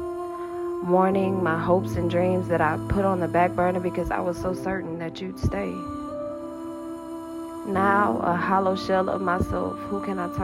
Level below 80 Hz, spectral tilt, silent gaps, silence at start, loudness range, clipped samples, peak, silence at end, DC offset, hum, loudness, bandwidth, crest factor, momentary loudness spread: -44 dBFS; -7.5 dB/octave; none; 0 s; 7 LU; under 0.1%; -8 dBFS; 0 s; under 0.1%; none; -25 LUFS; 15 kHz; 16 dB; 13 LU